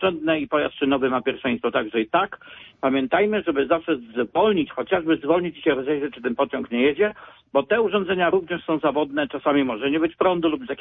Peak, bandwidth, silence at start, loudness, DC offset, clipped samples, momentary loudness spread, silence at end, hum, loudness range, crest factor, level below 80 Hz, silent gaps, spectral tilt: -6 dBFS; 3.9 kHz; 0 s; -22 LUFS; under 0.1%; under 0.1%; 5 LU; 0 s; none; 1 LU; 16 dB; -58 dBFS; none; -9.5 dB/octave